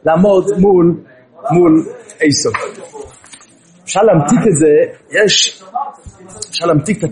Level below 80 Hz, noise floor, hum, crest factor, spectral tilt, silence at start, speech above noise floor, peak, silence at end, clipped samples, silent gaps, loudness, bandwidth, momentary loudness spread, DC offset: -46 dBFS; -45 dBFS; none; 12 dB; -4.5 dB/octave; 0.05 s; 33 dB; 0 dBFS; 0 s; under 0.1%; none; -12 LUFS; 11.5 kHz; 17 LU; under 0.1%